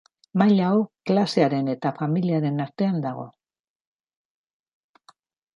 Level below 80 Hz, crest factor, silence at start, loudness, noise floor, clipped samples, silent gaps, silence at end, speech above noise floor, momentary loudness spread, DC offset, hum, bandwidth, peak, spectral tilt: -72 dBFS; 20 dB; 0.35 s; -23 LUFS; under -90 dBFS; under 0.1%; none; 2.25 s; over 68 dB; 10 LU; under 0.1%; none; 10.5 kHz; -6 dBFS; -8 dB/octave